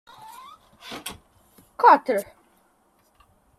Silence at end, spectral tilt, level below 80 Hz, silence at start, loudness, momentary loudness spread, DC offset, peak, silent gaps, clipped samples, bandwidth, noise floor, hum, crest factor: 1.35 s; -3.5 dB/octave; -66 dBFS; 0.85 s; -19 LUFS; 28 LU; under 0.1%; -2 dBFS; none; under 0.1%; 15 kHz; -64 dBFS; none; 24 dB